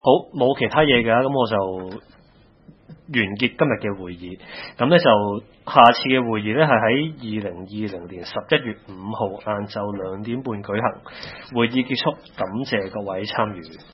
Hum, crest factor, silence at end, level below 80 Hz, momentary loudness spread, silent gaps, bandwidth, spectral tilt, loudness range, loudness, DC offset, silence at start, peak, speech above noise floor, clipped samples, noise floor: none; 22 dB; 0.1 s; -54 dBFS; 17 LU; none; 6 kHz; -8 dB/octave; 8 LU; -21 LUFS; under 0.1%; 0.05 s; 0 dBFS; 32 dB; under 0.1%; -53 dBFS